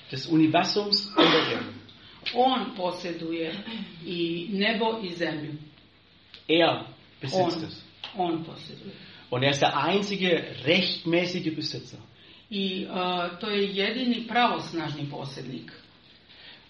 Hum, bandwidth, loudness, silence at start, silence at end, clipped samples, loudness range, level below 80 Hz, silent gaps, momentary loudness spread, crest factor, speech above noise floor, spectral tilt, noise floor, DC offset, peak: none; 7.8 kHz; -26 LUFS; 0 s; 0.15 s; under 0.1%; 4 LU; -68 dBFS; none; 18 LU; 22 dB; 30 dB; -3 dB/octave; -57 dBFS; under 0.1%; -6 dBFS